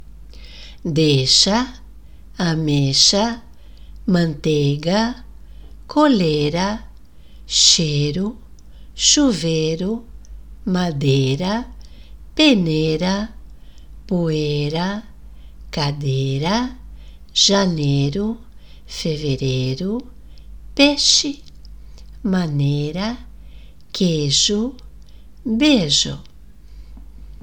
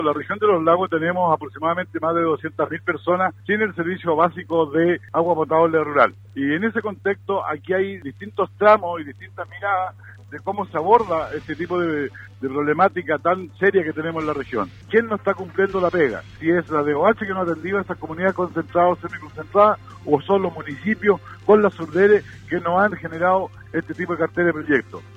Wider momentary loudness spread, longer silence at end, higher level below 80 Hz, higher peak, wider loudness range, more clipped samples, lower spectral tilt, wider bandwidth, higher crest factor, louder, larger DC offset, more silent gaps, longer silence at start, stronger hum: first, 16 LU vs 11 LU; about the same, 0 s vs 0 s; first, -40 dBFS vs -56 dBFS; about the same, 0 dBFS vs -2 dBFS; about the same, 5 LU vs 3 LU; neither; second, -4 dB/octave vs -8 dB/octave; first, 18.5 kHz vs 7.4 kHz; about the same, 20 dB vs 20 dB; first, -18 LUFS vs -21 LUFS; first, 0.8% vs under 0.1%; neither; about the same, 0.1 s vs 0 s; neither